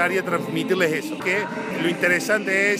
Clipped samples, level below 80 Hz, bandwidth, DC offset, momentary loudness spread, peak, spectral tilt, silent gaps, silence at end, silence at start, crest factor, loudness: under 0.1%; -70 dBFS; 15.5 kHz; under 0.1%; 6 LU; -6 dBFS; -4.5 dB/octave; none; 0 s; 0 s; 16 dB; -22 LUFS